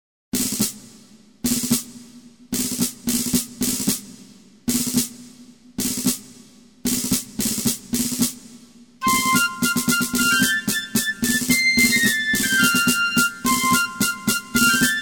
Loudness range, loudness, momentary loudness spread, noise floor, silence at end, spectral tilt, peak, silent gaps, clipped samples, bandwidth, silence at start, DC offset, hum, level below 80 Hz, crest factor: 7 LU; -20 LUFS; 9 LU; -49 dBFS; 0 s; -2 dB/octave; -4 dBFS; none; under 0.1%; over 20 kHz; 0.35 s; 0.1%; none; -48 dBFS; 18 dB